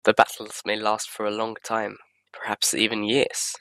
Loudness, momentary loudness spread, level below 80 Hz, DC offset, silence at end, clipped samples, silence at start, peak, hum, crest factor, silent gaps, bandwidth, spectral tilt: -24 LUFS; 10 LU; -68 dBFS; under 0.1%; 0.05 s; under 0.1%; 0.05 s; 0 dBFS; none; 24 dB; none; 16 kHz; -2 dB/octave